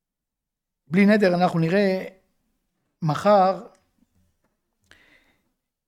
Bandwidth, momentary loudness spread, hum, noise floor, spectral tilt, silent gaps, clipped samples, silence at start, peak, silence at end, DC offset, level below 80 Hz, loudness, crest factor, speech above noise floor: 13 kHz; 12 LU; none; -85 dBFS; -7.5 dB/octave; none; under 0.1%; 0.9 s; -6 dBFS; 2.25 s; under 0.1%; -68 dBFS; -20 LUFS; 20 dB; 66 dB